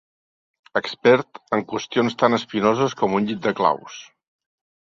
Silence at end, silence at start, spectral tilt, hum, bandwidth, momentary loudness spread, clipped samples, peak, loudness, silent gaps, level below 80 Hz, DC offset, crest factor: 0.85 s; 0.75 s; -5.5 dB/octave; none; 7.6 kHz; 9 LU; under 0.1%; -2 dBFS; -21 LUFS; none; -64 dBFS; under 0.1%; 20 dB